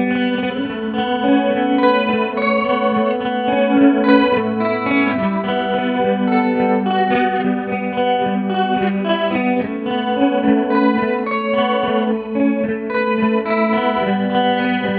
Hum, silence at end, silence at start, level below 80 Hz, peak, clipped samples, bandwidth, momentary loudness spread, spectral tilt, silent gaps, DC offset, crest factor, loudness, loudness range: none; 0 s; 0 s; -54 dBFS; 0 dBFS; under 0.1%; 4.8 kHz; 5 LU; -10 dB/octave; none; under 0.1%; 16 dB; -17 LUFS; 2 LU